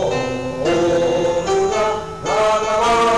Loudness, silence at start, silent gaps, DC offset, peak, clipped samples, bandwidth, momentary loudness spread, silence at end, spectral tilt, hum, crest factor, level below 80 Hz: -18 LUFS; 0 s; none; 0.6%; -12 dBFS; under 0.1%; 11 kHz; 5 LU; 0 s; -4.5 dB/octave; none; 6 dB; -42 dBFS